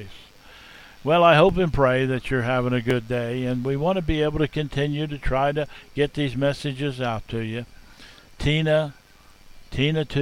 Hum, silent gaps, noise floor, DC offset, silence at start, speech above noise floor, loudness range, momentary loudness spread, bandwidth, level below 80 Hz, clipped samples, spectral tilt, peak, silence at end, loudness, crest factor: none; none; -49 dBFS; under 0.1%; 0 s; 27 dB; 6 LU; 11 LU; 13.5 kHz; -40 dBFS; under 0.1%; -7 dB/octave; -4 dBFS; 0 s; -23 LUFS; 20 dB